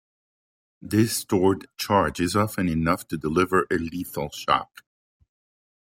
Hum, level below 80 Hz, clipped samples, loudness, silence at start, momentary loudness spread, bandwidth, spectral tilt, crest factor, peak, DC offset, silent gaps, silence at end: none; -52 dBFS; under 0.1%; -24 LUFS; 0.85 s; 8 LU; 16.5 kHz; -5 dB/octave; 20 dB; -6 dBFS; under 0.1%; none; 1.3 s